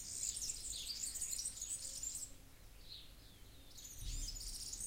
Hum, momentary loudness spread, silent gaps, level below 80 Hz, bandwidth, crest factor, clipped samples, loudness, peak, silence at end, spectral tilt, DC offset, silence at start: none; 20 LU; none; -54 dBFS; 16 kHz; 20 dB; under 0.1%; -44 LUFS; -26 dBFS; 0 s; 0 dB/octave; under 0.1%; 0 s